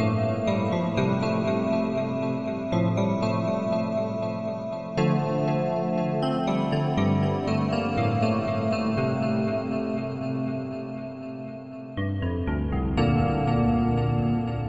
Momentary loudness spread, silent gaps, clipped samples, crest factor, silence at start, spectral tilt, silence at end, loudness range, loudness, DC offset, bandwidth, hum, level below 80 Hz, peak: 7 LU; none; under 0.1%; 14 dB; 0 s; -8 dB/octave; 0 s; 4 LU; -26 LUFS; 0.3%; 8.6 kHz; none; -42 dBFS; -10 dBFS